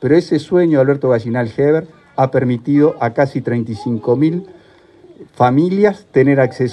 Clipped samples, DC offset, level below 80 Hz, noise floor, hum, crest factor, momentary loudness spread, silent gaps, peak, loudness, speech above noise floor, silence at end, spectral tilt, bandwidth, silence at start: under 0.1%; under 0.1%; -56 dBFS; -45 dBFS; none; 14 dB; 7 LU; none; 0 dBFS; -15 LUFS; 31 dB; 0 s; -8.5 dB/octave; 9.6 kHz; 0 s